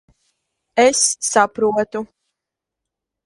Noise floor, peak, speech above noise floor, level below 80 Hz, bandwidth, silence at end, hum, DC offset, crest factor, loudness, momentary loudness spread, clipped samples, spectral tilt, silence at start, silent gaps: -84 dBFS; 0 dBFS; 67 dB; -62 dBFS; 11.5 kHz; 1.2 s; none; under 0.1%; 20 dB; -17 LUFS; 13 LU; under 0.1%; -1.5 dB/octave; 0.75 s; none